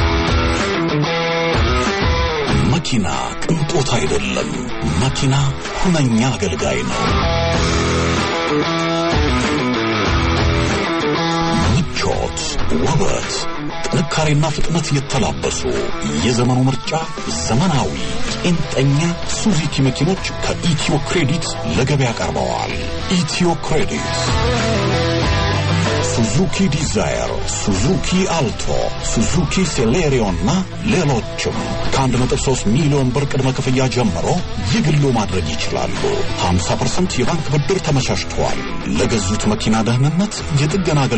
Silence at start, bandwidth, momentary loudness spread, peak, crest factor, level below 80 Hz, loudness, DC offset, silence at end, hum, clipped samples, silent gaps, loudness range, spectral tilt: 0 s; 8.8 kHz; 5 LU; -6 dBFS; 12 dB; -28 dBFS; -17 LUFS; 0.4%; 0 s; none; under 0.1%; none; 2 LU; -5 dB/octave